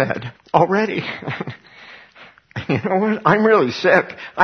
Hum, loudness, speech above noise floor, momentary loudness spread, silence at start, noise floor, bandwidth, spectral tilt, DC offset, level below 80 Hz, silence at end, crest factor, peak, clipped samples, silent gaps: none; -18 LUFS; 28 dB; 16 LU; 0 s; -46 dBFS; 6.6 kHz; -7 dB/octave; under 0.1%; -58 dBFS; 0 s; 18 dB; 0 dBFS; under 0.1%; none